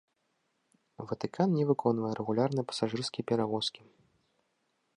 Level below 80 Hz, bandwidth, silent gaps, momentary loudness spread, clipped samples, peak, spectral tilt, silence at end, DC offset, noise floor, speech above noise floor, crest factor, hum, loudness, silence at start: -74 dBFS; 11 kHz; none; 9 LU; under 0.1%; -12 dBFS; -6.5 dB/octave; 1.2 s; under 0.1%; -78 dBFS; 47 dB; 20 dB; none; -31 LUFS; 1 s